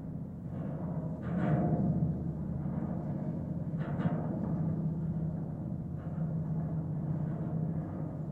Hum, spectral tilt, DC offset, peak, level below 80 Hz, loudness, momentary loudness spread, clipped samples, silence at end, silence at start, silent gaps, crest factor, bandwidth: none; -11.5 dB/octave; under 0.1%; -18 dBFS; -54 dBFS; -35 LUFS; 8 LU; under 0.1%; 0 s; 0 s; none; 16 dB; 3.5 kHz